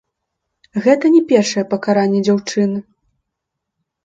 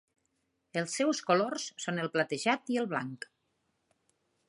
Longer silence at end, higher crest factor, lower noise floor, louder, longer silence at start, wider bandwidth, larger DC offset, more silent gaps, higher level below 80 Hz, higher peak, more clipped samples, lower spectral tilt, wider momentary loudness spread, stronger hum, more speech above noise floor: about the same, 1.25 s vs 1.3 s; second, 16 dB vs 22 dB; about the same, -78 dBFS vs -79 dBFS; first, -15 LUFS vs -32 LUFS; about the same, 0.75 s vs 0.75 s; second, 8 kHz vs 11.5 kHz; neither; neither; first, -64 dBFS vs -84 dBFS; first, 0 dBFS vs -12 dBFS; neither; first, -5.5 dB/octave vs -4 dB/octave; about the same, 8 LU vs 10 LU; neither; first, 64 dB vs 47 dB